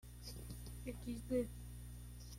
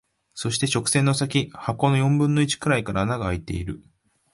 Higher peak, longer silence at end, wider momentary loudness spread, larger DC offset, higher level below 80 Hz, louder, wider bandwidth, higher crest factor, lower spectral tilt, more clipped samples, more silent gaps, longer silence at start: second, -28 dBFS vs -6 dBFS; second, 0 s vs 0.55 s; about the same, 12 LU vs 11 LU; neither; second, -54 dBFS vs -44 dBFS; second, -47 LUFS vs -23 LUFS; first, 16.5 kHz vs 11.5 kHz; about the same, 18 dB vs 18 dB; about the same, -6 dB/octave vs -5 dB/octave; neither; neither; second, 0.05 s vs 0.35 s